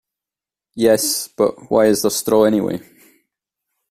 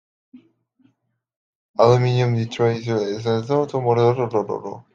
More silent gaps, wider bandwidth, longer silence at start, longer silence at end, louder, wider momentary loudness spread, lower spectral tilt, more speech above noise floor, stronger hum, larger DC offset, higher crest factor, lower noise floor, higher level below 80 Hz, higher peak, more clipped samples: second, none vs 1.36-1.74 s; first, 16 kHz vs 7.4 kHz; first, 0.75 s vs 0.35 s; first, 1.1 s vs 0.15 s; first, -17 LUFS vs -20 LUFS; about the same, 9 LU vs 8 LU; second, -4 dB/octave vs -7.5 dB/octave; first, 73 dB vs 50 dB; neither; neither; about the same, 16 dB vs 20 dB; first, -89 dBFS vs -69 dBFS; about the same, -56 dBFS vs -60 dBFS; about the same, -2 dBFS vs -2 dBFS; neither